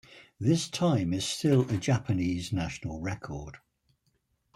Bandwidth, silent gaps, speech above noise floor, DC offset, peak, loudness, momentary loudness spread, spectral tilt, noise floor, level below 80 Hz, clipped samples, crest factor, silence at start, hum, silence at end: 13.5 kHz; none; 46 dB; under 0.1%; -14 dBFS; -29 LUFS; 12 LU; -6 dB/octave; -74 dBFS; -56 dBFS; under 0.1%; 16 dB; 0.1 s; none; 1 s